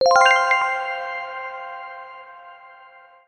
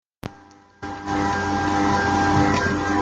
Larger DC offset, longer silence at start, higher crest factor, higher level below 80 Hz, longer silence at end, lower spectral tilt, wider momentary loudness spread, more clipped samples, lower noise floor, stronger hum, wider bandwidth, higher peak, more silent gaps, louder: neither; second, 0 s vs 0.25 s; about the same, 18 dB vs 16 dB; second, -66 dBFS vs -44 dBFS; first, 0.6 s vs 0 s; second, 0.5 dB/octave vs -5.5 dB/octave; first, 25 LU vs 19 LU; neither; about the same, -48 dBFS vs -49 dBFS; neither; first, 12 kHz vs 9.2 kHz; about the same, -4 dBFS vs -6 dBFS; neither; about the same, -19 LUFS vs -21 LUFS